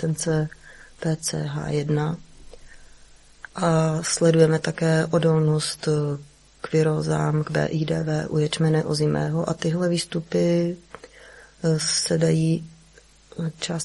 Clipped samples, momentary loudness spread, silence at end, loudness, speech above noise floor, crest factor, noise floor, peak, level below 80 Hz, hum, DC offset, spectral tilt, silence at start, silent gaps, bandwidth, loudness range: under 0.1%; 9 LU; 0 s; -23 LUFS; 31 dB; 20 dB; -53 dBFS; -4 dBFS; -52 dBFS; none; under 0.1%; -5.5 dB/octave; 0 s; none; 11.5 kHz; 5 LU